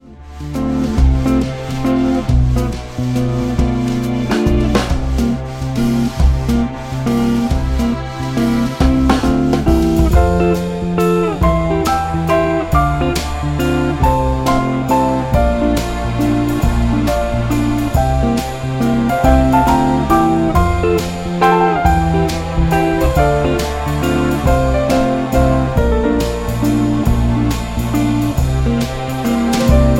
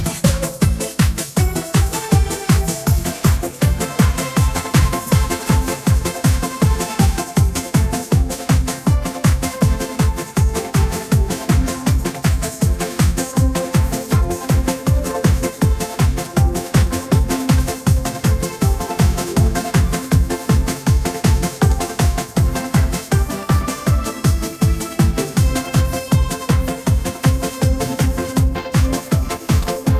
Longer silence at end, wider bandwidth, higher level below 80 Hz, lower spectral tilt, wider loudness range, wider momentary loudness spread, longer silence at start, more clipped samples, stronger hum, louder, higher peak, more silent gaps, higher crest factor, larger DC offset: about the same, 0 s vs 0 s; about the same, 16.5 kHz vs 16 kHz; about the same, -20 dBFS vs -22 dBFS; first, -7 dB/octave vs -5.5 dB/octave; about the same, 3 LU vs 1 LU; first, 6 LU vs 2 LU; about the same, 0.05 s vs 0 s; neither; neither; first, -15 LUFS vs -18 LUFS; about the same, 0 dBFS vs 0 dBFS; neither; about the same, 14 dB vs 16 dB; neither